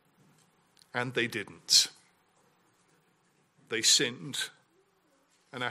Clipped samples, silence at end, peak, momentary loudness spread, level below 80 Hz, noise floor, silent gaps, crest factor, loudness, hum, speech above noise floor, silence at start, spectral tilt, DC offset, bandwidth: under 0.1%; 0 s; -8 dBFS; 15 LU; -82 dBFS; -70 dBFS; none; 26 dB; -27 LUFS; none; 41 dB; 0.95 s; -1 dB/octave; under 0.1%; 16 kHz